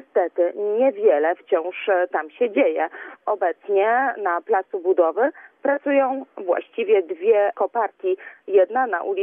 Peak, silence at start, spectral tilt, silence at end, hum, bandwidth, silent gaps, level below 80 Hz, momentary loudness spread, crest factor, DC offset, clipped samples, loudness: -6 dBFS; 0.15 s; -7.5 dB/octave; 0 s; none; 3.6 kHz; none; under -90 dBFS; 7 LU; 14 dB; under 0.1%; under 0.1%; -21 LUFS